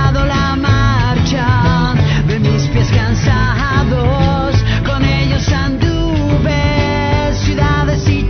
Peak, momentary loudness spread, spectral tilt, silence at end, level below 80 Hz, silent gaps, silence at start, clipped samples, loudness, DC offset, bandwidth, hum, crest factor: 0 dBFS; 2 LU; -6.5 dB/octave; 0 s; -20 dBFS; none; 0 s; under 0.1%; -13 LUFS; under 0.1%; 6.6 kHz; none; 12 dB